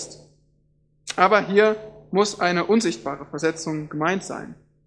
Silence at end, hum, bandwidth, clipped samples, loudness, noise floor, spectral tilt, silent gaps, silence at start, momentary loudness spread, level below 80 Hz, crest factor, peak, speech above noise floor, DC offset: 0.35 s; none; 10.5 kHz; under 0.1%; -22 LUFS; -63 dBFS; -4.5 dB/octave; none; 0 s; 16 LU; -62 dBFS; 22 dB; 0 dBFS; 42 dB; under 0.1%